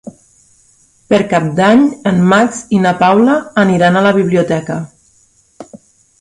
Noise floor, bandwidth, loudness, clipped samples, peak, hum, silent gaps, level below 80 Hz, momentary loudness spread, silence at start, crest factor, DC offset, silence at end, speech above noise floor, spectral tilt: -52 dBFS; 11 kHz; -11 LUFS; under 0.1%; 0 dBFS; none; none; -50 dBFS; 7 LU; 0.05 s; 12 dB; under 0.1%; 0.45 s; 41 dB; -6.5 dB/octave